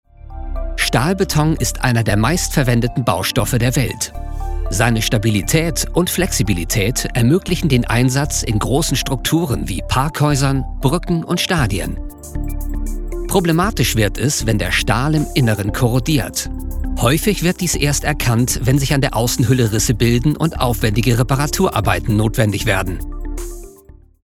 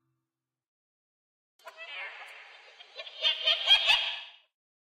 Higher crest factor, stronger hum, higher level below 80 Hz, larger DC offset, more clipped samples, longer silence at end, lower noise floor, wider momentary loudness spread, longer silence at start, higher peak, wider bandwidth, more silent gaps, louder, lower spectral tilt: second, 16 dB vs 22 dB; neither; first, -26 dBFS vs -70 dBFS; neither; neither; about the same, 0.55 s vs 0.55 s; second, -43 dBFS vs -89 dBFS; second, 11 LU vs 25 LU; second, 0.25 s vs 1.65 s; first, 0 dBFS vs -10 dBFS; about the same, 17.5 kHz vs 16 kHz; neither; first, -17 LUFS vs -24 LUFS; first, -5 dB/octave vs 2.5 dB/octave